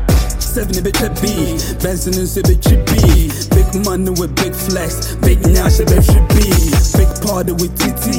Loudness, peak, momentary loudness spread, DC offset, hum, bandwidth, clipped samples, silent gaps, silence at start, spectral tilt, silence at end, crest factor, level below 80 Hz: -14 LUFS; 0 dBFS; 7 LU; under 0.1%; none; 17 kHz; under 0.1%; none; 0 s; -5 dB/octave; 0 s; 12 dB; -16 dBFS